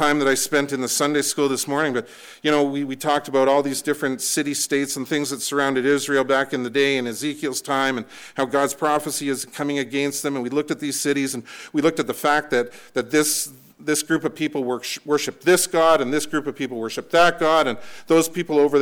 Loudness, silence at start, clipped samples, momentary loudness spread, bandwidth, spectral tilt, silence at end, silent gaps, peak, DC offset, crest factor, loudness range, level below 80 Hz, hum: -21 LUFS; 0 s; under 0.1%; 8 LU; 19.5 kHz; -3 dB/octave; 0 s; none; -8 dBFS; under 0.1%; 14 dB; 4 LU; -60 dBFS; none